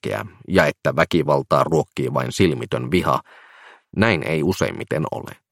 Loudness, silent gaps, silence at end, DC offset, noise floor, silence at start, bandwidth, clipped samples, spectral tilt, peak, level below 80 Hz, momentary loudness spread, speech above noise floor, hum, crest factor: -20 LUFS; none; 0.2 s; under 0.1%; -48 dBFS; 0.05 s; 16.5 kHz; under 0.1%; -6 dB/octave; 0 dBFS; -50 dBFS; 8 LU; 27 dB; none; 20 dB